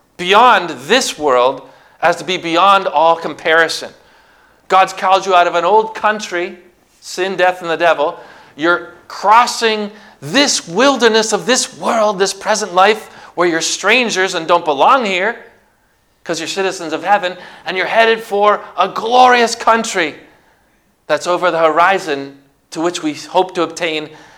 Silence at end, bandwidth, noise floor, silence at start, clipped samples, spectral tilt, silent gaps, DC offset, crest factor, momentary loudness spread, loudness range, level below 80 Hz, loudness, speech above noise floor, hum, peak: 0.2 s; 18 kHz; -57 dBFS; 0.2 s; 0.2%; -2.5 dB/octave; none; under 0.1%; 14 dB; 11 LU; 4 LU; -60 dBFS; -14 LUFS; 43 dB; none; 0 dBFS